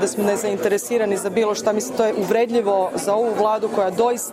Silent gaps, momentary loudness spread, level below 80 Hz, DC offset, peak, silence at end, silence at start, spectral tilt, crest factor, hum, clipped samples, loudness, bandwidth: none; 2 LU; -62 dBFS; under 0.1%; -6 dBFS; 0 s; 0 s; -4 dB/octave; 14 dB; none; under 0.1%; -20 LUFS; 16 kHz